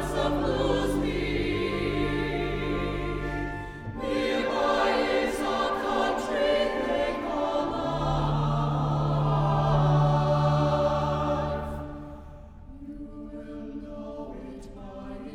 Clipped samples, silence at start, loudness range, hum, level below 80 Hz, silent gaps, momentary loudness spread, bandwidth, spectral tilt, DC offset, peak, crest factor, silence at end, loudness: under 0.1%; 0 s; 10 LU; none; -40 dBFS; none; 17 LU; 12.5 kHz; -7 dB/octave; under 0.1%; -12 dBFS; 14 dB; 0 s; -27 LUFS